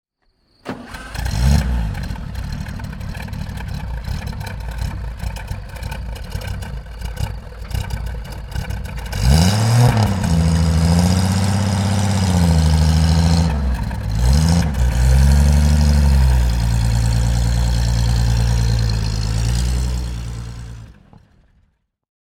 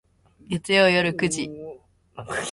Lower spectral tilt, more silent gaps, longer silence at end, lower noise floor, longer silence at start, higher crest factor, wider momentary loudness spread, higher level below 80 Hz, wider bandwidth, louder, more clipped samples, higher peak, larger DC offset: first, -6 dB/octave vs -4 dB/octave; neither; first, 1.4 s vs 0 s; first, -62 dBFS vs -45 dBFS; first, 0.65 s vs 0.5 s; about the same, 16 dB vs 18 dB; second, 15 LU vs 22 LU; first, -20 dBFS vs -56 dBFS; first, 16 kHz vs 11.5 kHz; first, -18 LUFS vs -22 LUFS; neither; first, 0 dBFS vs -6 dBFS; neither